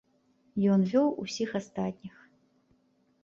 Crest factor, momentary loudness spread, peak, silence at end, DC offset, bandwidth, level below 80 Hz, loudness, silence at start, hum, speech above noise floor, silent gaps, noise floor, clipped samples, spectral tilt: 16 dB; 16 LU; -14 dBFS; 1.15 s; under 0.1%; 7.6 kHz; -70 dBFS; -29 LUFS; 0.55 s; none; 41 dB; none; -69 dBFS; under 0.1%; -7 dB/octave